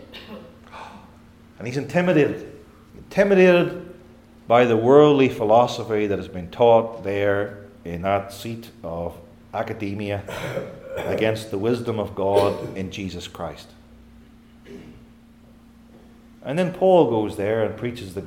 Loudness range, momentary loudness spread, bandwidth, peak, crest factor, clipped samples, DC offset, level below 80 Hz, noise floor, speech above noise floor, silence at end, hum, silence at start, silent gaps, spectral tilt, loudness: 11 LU; 22 LU; 16 kHz; 0 dBFS; 22 dB; under 0.1%; under 0.1%; -54 dBFS; -49 dBFS; 29 dB; 0 s; none; 0.1 s; none; -6.5 dB/octave; -21 LUFS